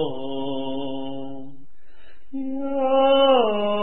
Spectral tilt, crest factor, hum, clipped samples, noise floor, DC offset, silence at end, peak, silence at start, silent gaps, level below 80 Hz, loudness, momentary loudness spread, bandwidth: -9.5 dB/octave; 16 dB; none; under 0.1%; -53 dBFS; 3%; 0 s; -8 dBFS; 0 s; none; -56 dBFS; -22 LUFS; 19 LU; 3.8 kHz